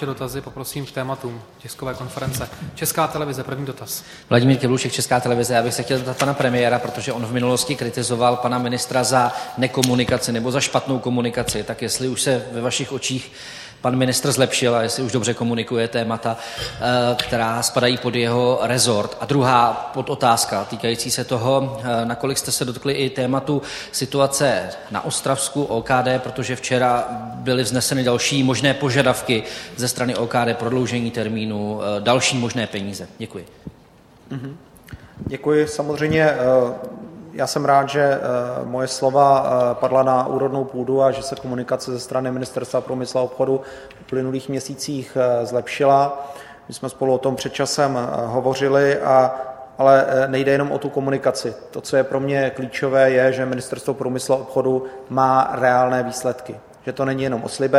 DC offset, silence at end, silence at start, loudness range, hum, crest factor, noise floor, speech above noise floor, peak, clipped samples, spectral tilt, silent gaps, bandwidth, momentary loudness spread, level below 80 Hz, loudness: under 0.1%; 0 s; 0 s; 5 LU; none; 20 dB; -49 dBFS; 29 dB; 0 dBFS; under 0.1%; -4.5 dB/octave; none; 15.5 kHz; 12 LU; -52 dBFS; -20 LUFS